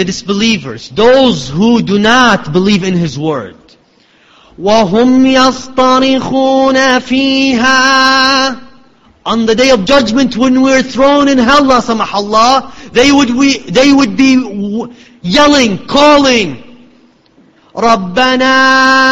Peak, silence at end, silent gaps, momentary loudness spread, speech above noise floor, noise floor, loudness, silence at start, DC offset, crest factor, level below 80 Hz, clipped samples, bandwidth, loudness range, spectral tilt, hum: 0 dBFS; 0 s; none; 10 LU; 39 dB; -48 dBFS; -9 LUFS; 0 s; under 0.1%; 10 dB; -40 dBFS; 0.3%; 8.2 kHz; 3 LU; -4 dB/octave; none